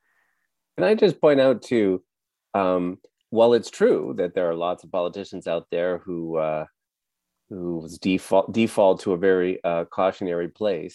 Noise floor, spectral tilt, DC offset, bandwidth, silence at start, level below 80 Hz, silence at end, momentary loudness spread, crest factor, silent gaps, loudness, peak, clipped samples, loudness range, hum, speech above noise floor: -84 dBFS; -6 dB/octave; under 0.1%; 12 kHz; 0.75 s; -66 dBFS; 0.05 s; 12 LU; 18 dB; none; -23 LUFS; -6 dBFS; under 0.1%; 7 LU; none; 62 dB